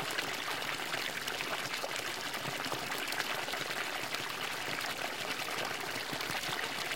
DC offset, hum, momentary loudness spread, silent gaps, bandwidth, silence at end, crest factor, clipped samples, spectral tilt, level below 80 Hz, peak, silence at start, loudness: 0.2%; none; 2 LU; none; 17 kHz; 0 s; 22 dB; under 0.1%; -1.5 dB/octave; -70 dBFS; -16 dBFS; 0 s; -35 LUFS